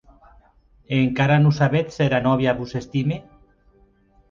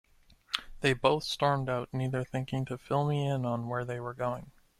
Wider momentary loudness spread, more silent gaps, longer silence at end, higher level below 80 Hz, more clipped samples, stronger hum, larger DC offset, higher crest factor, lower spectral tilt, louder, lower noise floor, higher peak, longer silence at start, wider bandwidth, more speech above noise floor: about the same, 10 LU vs 8 LU; neither; first, 1.1 s vs 0.3 s; first, -50 dBFS vs -58 dBFS; neither; neither; neither; second, 16 dB vs 24 dB; first, -7.5 dB/octave vs -6 dB/octave; first, -20 LUFS vs -32 LUFS; about the same, -57 dBFS vs -55 dBFS; first, -4 dBFS vs -8 dBFS; first, 0.9 s vs 0.5 s; second, 7.2 kHz vs 14 kHz; first, 37 dB vs 24 dB